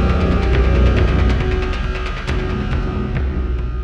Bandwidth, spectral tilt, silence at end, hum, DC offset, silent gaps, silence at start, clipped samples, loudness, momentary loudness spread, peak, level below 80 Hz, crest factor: 7.2 kHz; -7.5 dB/octave; 0 s; none; under 0.1%; none; 0 s; under 0.1%; -19 LUFS; 8 LU; -4 dBFS; -18 dBFS; 12 dB